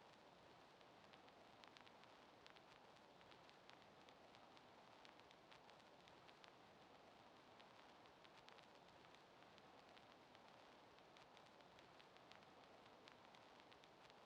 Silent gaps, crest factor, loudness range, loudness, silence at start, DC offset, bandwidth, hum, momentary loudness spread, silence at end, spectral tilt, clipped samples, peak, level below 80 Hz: none; 26 dB; 0 LU; -67 LUFS; 0 s; under 0.1%; 9.4 kHz; none; 2 LU; 0 s; -3.5 dB/octave; under 0.1%; -40 dBFS; under -90 dBFS